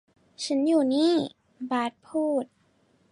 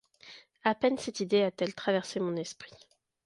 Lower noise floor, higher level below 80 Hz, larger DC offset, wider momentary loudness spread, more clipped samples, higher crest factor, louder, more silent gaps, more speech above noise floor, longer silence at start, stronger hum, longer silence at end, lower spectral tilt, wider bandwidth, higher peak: first, -65 dBFS vs -55 dBFS; about the same, -76 dBFS vs -72 dBFS; neither; second, 14 LU vs 22 LU; neither; second, 14 dB vs 20 dB; first, -26 LUFS vs -31 LUFS; neither; first, 40 dB vs 24 dB; first, 0.4 s vs 0.25 s; neither; about the same, 0.65 s vs 0.55 s; about the same, -4.5 dB/octave vs -4.5 dB/octave; about the same, 11.5 kHz vs 11.5 kHz; about the same, -12 dBFS vs -12 dBFS